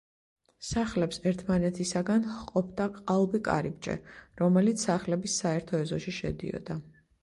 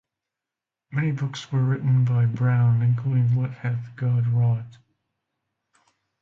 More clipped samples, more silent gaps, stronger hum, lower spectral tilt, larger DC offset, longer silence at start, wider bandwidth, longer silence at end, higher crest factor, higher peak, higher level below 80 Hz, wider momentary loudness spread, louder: neither; neither; neither; second, -5.5 dB/octave vs -8 dB/octave; neither; second, 0.6 s vs 0.9 s; first, 11.5 kHz vs 7.2 kHz; second, 0.35 s vs 1.5 s; first, 18 dB vs 12 dB; about the same, -12 dBFS vs -12 dBFS; about the same, -54 dBFS vs -58 dBFS; about the same, 11 LU vs 9 LU; second, -30 LUFS vs -23 LUFS